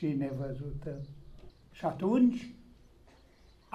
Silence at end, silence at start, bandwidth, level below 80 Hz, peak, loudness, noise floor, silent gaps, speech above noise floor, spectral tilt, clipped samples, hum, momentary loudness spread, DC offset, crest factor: 1.1 s; 0 s; 7.6 kHz; -54 dBFS; -16 dBFS; -33 LUFS; -60 dBFS; none; 29 dB; -9 dB/octave; under 0.1%; none; 21 LU; under 0.1%; 18 dB